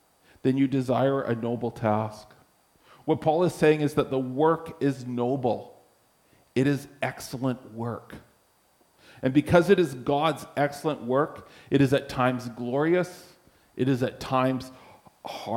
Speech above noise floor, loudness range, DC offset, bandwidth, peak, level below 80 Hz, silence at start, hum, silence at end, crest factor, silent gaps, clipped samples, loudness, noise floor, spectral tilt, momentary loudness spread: 39 dB; 5 LU; under 0.1%; 16.5 kHz; -6 dBFS; -58 dBFS; 0.45 s; none; 0 s; 20 dB; none; under 0.1%; -26 LUFS; -64 dBFS; -7 dB/octave; 12 LU